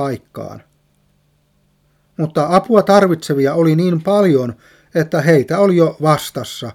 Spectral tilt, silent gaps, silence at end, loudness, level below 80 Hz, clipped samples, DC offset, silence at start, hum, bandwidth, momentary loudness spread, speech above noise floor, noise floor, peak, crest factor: -7 dB/octave; none; 0 s; -14 LUFS; -58 dBFS; under 0.1%; under 0.1%; 0 s; none; 16 kHz; 14 LU; 45 dB; -59 dBFS; 0 dBFS; 16 dB